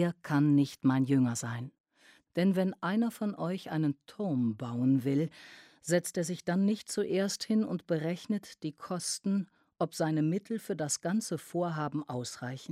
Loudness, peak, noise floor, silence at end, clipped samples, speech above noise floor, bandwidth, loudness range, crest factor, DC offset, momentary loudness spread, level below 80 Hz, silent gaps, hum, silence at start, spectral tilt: -32 LUFS; -14 dBFS; -64 dBFS; 0 s; under 0.1%; 32 dB; 15.5 kHz; 3 LU; 16 dB; under 0.1%; 10 LU; -76 dBFS; 1.80-1.84 s; none; 0 s; -5.5 dB/octave